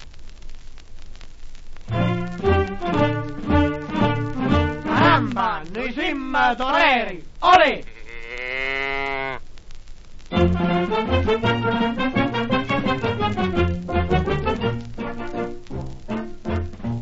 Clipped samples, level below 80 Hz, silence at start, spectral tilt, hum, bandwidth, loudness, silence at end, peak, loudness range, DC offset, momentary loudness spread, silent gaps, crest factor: under 0.1%; -34 dBFS; 0 s; -7 dB/octave; none; 8 kHz; -21 LUFS; 0 s; -2 dBFS; 5 LU; under 0.1%; 14 LU; none; 20 dB